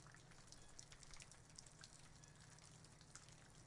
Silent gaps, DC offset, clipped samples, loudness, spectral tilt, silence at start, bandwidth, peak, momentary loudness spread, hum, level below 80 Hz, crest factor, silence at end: none; under 0.1%; under 0.1%; -62 LUFS; -2.5 dB/octave; 0 s; 12 kHz; -34 dBFS; 4 LU; none; -72 dBFS; 28 dB; 0 s